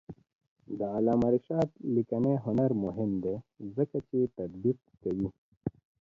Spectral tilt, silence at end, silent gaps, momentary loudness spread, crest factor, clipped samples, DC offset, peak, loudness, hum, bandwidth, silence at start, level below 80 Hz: -11 dB/octave; 0.35 s; 0.35-0.39 s, 0.48-0.56 s, 5.38-5.61 s; 13 LU; 16 dB; under 0.1%; under 0.1%; -14 dBFS; -31 LUFS; none; 7.2 kHz; 0.1 s; -60 dBFS